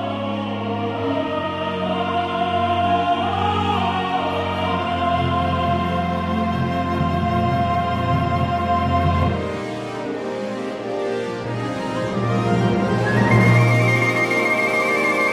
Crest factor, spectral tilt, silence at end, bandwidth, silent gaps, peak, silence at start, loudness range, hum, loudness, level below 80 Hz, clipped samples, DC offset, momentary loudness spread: 16 dB; -6.5 dB/octave; 0 s; 13.5 kHz; none; -2 dBFS; 0 s; 5 LU; none; -20 LUFS; -42 dBFS; under 0.1%; under 0.1%; 9 LU